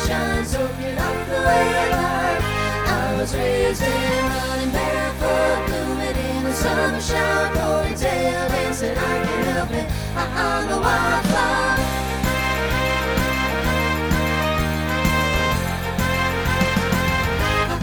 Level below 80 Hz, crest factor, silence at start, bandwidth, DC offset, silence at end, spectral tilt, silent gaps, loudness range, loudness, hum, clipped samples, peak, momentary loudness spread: -30 dBFS; 16 dB; 0 s; over 20 kHz; under 0.1%; 0 s; -4.5 dB/octave; none; 1 LU; -20 LUFS; none; under 0.1%; -4 dBFS; 4 LU